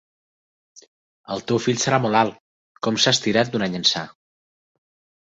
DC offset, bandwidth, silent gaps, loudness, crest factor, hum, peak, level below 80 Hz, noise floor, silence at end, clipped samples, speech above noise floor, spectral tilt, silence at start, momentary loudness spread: under 0.1%; 8.2 kHz; 2.40-2.75 s; -20 LUFS; 22 dB; none; -2 dBFS; -62 dBFS; under -90 dBFS; 1.15 s; under 0.1%; over 69 dB; -3.5 dB/octave; 1.3 s; 11 LU